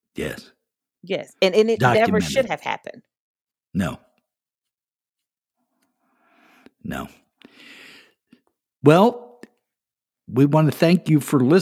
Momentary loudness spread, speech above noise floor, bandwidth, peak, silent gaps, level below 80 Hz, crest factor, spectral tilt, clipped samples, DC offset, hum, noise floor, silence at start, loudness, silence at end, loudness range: 19 LU; over 71 dB; 16 kHz; 0 dBFS; 3.19-3.35 s, 3.41-3.47 s, 5.09-5.13 s; -56 dBFS; 22 dB; -6.5 dB/octave; under 0.1%; under 0.1%; none; under -90 dBFS; 0.2 s; -20 LUFS; 0 s; 20 LU